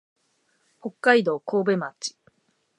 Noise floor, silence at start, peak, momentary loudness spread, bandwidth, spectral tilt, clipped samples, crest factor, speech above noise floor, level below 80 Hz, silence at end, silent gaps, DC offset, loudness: -69 dBFS; 0.85 s; -4 dBFS; 17 LU; 11.5 kHz; -4.5 dB/octave; under 0.1%; 22 dB; 46 dB; -82 dBFS; 0.7 s; none; under 0.1%; -23 LUFS